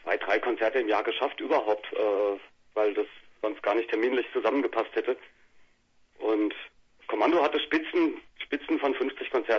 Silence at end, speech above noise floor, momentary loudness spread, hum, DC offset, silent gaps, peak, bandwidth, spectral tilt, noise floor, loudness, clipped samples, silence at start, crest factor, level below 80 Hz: 0 s; 37 dB; 9 LU; none; under 0.1%; none; -10 dBFS; 6.8 kHz; -4.5 dB/octave; -64 dBFS; -28 LUFS; under 0.1%; 0.05 s; 18 dB; -68 dBFS